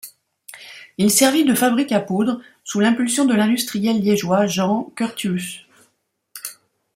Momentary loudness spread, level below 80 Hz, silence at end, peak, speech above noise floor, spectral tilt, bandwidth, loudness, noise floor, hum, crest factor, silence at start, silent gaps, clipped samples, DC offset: 19 LU; -64 dBFS; 0.45 s; -2 dBFS; 50 dB; -4 dB/octave; 16.5 kHz; -18 LUFS; -68 dBFS; none; 18 dB; 0.05 s; none; under 0.1%; under 0.1%